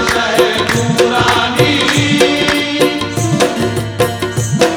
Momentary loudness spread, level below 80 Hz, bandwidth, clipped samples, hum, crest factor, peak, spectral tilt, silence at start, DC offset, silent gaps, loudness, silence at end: 6 LU; -38 dBFS; 19.5 kHz; under 0.1%; none; 12 dB; 0 dBFS; -4 dB/octave; 0 s; under 0.1%; none; -12 LUFS; 0 s